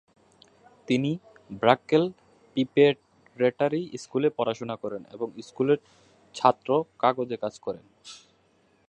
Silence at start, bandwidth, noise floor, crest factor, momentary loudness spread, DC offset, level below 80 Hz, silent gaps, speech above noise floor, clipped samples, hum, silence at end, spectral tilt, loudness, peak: 0.9 s; 9.2 kHz; -65 dBFS; 24 dB; 15 LU; under 0.1%; -70 dBFS; none; 39 dB; under 0.1%; none; 0.7 s; -6 dB/octave; -26 LUFS; -2 dBFS